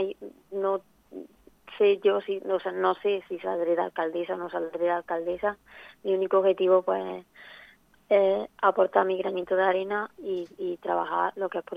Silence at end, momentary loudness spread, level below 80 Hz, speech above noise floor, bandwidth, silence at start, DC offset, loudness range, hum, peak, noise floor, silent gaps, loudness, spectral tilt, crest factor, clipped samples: 0 s; 15 LU; -70 dBFS; 29 dB; 5 kHz; 0 s; under 0.1%; 3 LU; none; -6 dBFS; -56 dBFS; none; -27 LUFS; -7 dB/octave; 20 dB; under 0.1%